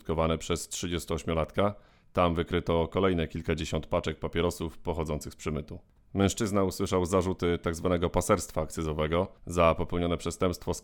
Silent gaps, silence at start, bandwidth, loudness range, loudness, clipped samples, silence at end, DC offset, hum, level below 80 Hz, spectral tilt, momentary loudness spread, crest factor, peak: none; 0.05 s; 18.5 kHz; 3 LU; -30 LUFS; under 0.1%; 0.05 s; under 0.1%; none; -44 dBFS; -5.5 dB/octave; 8 LU; 20 dB; -8 dBFS